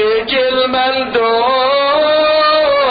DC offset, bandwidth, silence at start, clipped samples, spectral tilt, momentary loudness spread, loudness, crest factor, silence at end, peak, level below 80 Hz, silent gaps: under 0.1%; 5 kHz; 0 s; under 0.1%; -6.5 dB/octave; 3 LU; -12 LUFS; 10 dB; 0 s; -2 dBFS; -48 dBFS; none